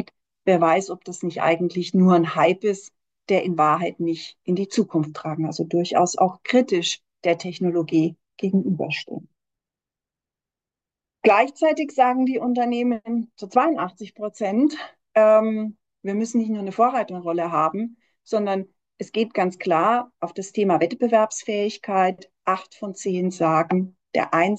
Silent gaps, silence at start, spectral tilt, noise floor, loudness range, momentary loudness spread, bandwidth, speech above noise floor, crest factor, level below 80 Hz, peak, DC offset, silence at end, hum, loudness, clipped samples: none; 0 s; -5.5 dB/octave; -90 dBFS; 3 LU; 11 LU; 8.8 kHz; 68 dB; 18 dB; -74 dBFS; -4 dBFS; under 0.1%; 0 s; none; -22 LUFS; under 0.1%